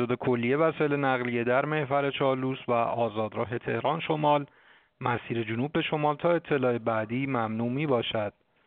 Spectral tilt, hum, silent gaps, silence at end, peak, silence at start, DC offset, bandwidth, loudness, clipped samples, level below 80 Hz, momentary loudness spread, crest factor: -5 dB/octave; none; none; 0.35 s; -10 dBFS; 0 s; under 0.1%; 4.5 kHz; -28 LUFS; under 0.1%; -66 dBFS; 6 LU; 18 dB